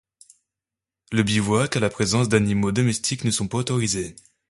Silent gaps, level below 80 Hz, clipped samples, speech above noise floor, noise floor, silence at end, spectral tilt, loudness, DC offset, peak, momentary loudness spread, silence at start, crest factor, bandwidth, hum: none; -50 dBFS; under 0.1%; 67 dB; -89 dBFS; 0.4 s; -4.5 dB/octave; -22 LUFS; under 0.1%; -4 dBFS; 5 LU; 1.1 s; 20 dB; 11.5 kHz; none